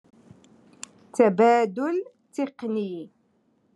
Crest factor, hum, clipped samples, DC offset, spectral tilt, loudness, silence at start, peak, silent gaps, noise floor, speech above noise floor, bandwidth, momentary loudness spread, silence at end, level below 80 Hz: 20 dB; none; under 0.1%; under 0.1%; -6 dB/octave; -24 LUFS; 1.15 s; -6 dBFS; none; -66 dBFS; 44 dB; 11.5 kHz; 22 LU; 0.7 s; -82 dBFS